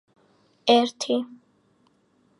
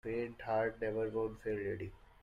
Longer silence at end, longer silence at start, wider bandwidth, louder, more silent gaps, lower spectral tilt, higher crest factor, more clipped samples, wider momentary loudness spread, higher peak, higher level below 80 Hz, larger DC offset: first, 1.15 s vs 0.25 s; first, 0.65 s vs 0.05 s; first, 11.5 kHz vs 10 kHz; first, -23 LUFS vs -38 LUFS; neither; second, -3 dB/octave vs -8 dB/octave; first, 22 dB vs 14 dB; neither; first, 10 LU vs 7 LU; first, -4 dBFS vs -24 dBFS; second, -80 dBFS vs -60 dBFS; neither